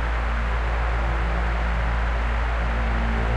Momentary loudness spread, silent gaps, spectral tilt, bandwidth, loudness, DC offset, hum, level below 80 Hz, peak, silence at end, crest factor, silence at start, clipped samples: 1 LU; none; -6.5 dB/octave; 7.4 kHz; -25 LUFS; under 0.1%; none; -24 dBFS; -12 dBFS; 0 s; 10 dB; 0 s; under 0.1%